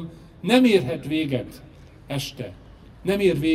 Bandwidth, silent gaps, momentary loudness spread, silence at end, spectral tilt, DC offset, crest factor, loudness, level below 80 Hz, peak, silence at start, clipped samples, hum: 15.5 kHz; none; 20 LU; 0 s; -6 dB/octave; under 0.1%; 20 dB; -23 LUFS; -50 dBFS; -4 dBFS; 0 s; under 0.1%; none